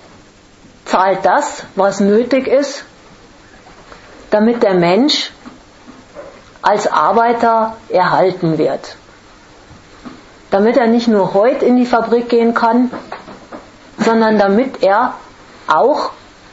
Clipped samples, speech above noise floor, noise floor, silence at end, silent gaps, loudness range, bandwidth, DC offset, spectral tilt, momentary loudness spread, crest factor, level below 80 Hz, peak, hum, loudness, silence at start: under 0.1%; 31 dB; -43 dBFS; 0.4 s; none; 3 LU; 8 kHz; under 0.1%; -5.5 dB/octave; 19 LU; 14 dB; -52 dBFS; 0 dBFS; none; -13 LUFS; 0.85 s